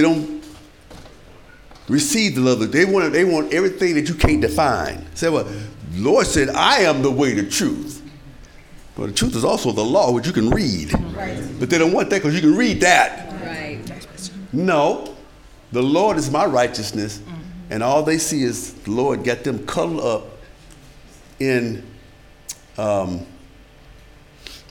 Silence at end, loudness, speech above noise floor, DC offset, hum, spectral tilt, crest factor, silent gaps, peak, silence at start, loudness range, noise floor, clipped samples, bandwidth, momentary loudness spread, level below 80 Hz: 0.1 s; -19 LUFS; 27 dB; under 0.1%; none; -4.5 dB/octave; 20 dB; none; 0 dBFS; 0 s; 8 LU; -45 dBFS; under 0.1%; 19.5 kHz; 17 LU; -38 dBFS